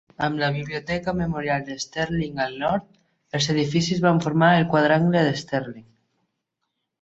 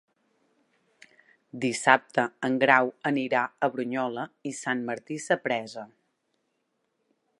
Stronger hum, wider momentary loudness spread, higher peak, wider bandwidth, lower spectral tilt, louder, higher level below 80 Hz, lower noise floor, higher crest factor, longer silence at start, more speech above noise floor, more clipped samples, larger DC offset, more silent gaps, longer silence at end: neither; second, 10 LU vs 14 LU; about the same, -4 dBFS vs -2 dBFS; second, 8 kHz vs 11.5 kHz; first, -5.5 dB/octave vs -4 dB/octave; first, -22 LUFS vs -26 LUFS; first, -52 dBFS vs -80 dBFS; about the same, -79 dBFS vs -77 dBFS; second, 18 dB vs 28 dB; second, 0.2 s vs 1.55 s; first, 57 dB vs 50 dB; neither; neither; neither; second, 1.2 s vs 1.55 s